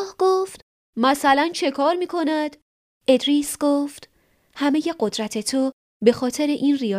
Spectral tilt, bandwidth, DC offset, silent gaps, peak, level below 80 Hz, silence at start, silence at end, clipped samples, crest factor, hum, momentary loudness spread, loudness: -3.5 dB/octave; 15.5 kHz; under 0.1%; 0.62-0.93 s, 2.62-3.01 s, 5.73-6.00 s; -2 dBFS; -62 dBFS; 0 s; 0 s; under 0.1%; 20 dB; none; 8 LU; -21 LUFS